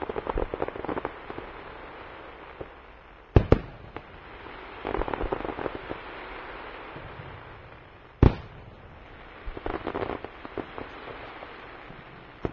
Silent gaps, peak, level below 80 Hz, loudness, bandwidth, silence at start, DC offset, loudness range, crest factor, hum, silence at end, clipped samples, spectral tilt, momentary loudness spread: none; -4 dBFS; -38 dBFS; -32 LUFS; 6 kHz; 0 s; under 0.1%; 8 LU; 28 dB; none; 0 s; under 0.1%; -6.5 dB/octave; 21 LU